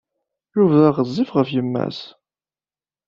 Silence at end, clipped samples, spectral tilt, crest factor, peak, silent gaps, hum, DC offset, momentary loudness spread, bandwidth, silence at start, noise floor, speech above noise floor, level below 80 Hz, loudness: 1 s; under 0.1%; -9 dB/octave; 18 dB; -2 dBFS; none; none; under 0.1%; 13 LU; 7.2 kHz; 0.55 s; under -90 dBFS; over 72 dB; -60 dBFS; -19 LUFS